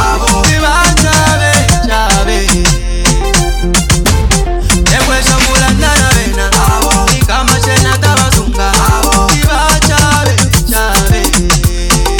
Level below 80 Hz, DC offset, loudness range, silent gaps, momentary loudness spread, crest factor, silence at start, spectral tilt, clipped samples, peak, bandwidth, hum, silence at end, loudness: -14 dBFS; under 0.1%; 1 LU; none; 3 LU; 8 dB; 0 s; -3.5 dB/octave; 0.8%; 0 dBFS; 19.5 kHz; none; 0 s; -9 LUFS